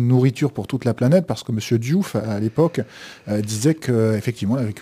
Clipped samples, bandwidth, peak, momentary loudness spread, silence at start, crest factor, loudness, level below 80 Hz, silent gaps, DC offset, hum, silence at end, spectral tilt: under 0.1%; 15.5 kHz; -4 dBFS; 8 LU; 0 s; 16 dB; -21 LUFS; -58 dBFS; none; under 0.1%; none; 0 s; -7 dB/octave